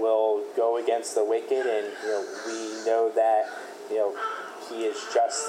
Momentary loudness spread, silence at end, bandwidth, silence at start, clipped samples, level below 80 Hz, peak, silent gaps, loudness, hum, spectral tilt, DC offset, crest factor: 10 LU; 0 s; 14.5 kHz; 0 s; under 0.1%; under -90 dBFS; -12 dBFS; none; -27 LUFS; none; -1 dB/octave; under 0.1%; 14 dB